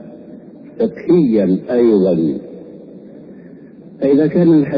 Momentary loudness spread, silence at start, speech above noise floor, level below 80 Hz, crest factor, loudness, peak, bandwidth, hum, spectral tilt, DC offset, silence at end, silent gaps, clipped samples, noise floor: 23 LU; 0 s; 25 dB; -54 dBFS; 14 dB; -14 LUFS; -2 dBFS; 5 kHz; none; -11.5 dB/octave; under 0.1%; 0 s; none; under 0.1%; -38 dBFS